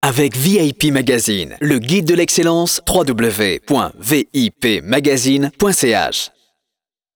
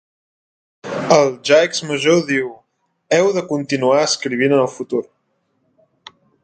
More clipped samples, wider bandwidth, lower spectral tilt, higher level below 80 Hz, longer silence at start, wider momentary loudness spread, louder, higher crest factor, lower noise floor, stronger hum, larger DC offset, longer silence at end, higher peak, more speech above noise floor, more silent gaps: neither; first, over 20 kHz vs 9.4 kHz; about the same, -4 dB/octave vs -4 dB/octave; first, -42 dBFS vs -66 dBFS; second, 0 s vs 0.85 s; second, 4 LU vs 10 LU; about the same, -15 LUFS vs -17 LUFS; about the same, 14 dB vs 18 dB; first, -83 dBFS vs -66 dBFS; neither; neither; second, 0.9 s vs 1.4 s; about the same, -2 dBFS vs 0 dBFS; first, 68 dB vs 51 dB; neither